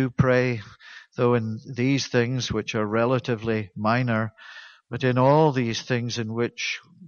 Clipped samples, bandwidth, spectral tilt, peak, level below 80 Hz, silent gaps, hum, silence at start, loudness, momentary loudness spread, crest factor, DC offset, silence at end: under 0.1%; 7 kHz; -6 dB/octave; -6 dBFS; -54 dBFS; none; none; 0 s; -24 LUFS; 15 LU; 18 dB; under 0.1%; 0 s